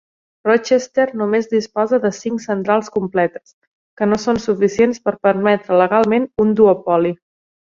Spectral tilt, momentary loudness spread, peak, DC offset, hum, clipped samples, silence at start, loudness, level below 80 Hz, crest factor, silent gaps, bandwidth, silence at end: -6 dB/octave; 8 LU; -2 dBFS; under 0.1%; none; under 0.1%; 0.45 s; -17 LUFS; -54 dBFS; 14 dB; 3.54-3.97 s; 7.6 kHz; 0.5 s